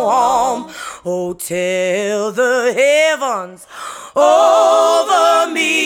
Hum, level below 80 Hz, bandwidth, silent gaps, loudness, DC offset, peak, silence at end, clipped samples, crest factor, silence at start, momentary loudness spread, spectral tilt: none; -58 dBFS; 18 kHz; none; -14 LUFS; under 0.1%; 0 dBFS; 0 s; under 0.1%; 14 dB; 0 s; 15 LU; -2.5 dB/octave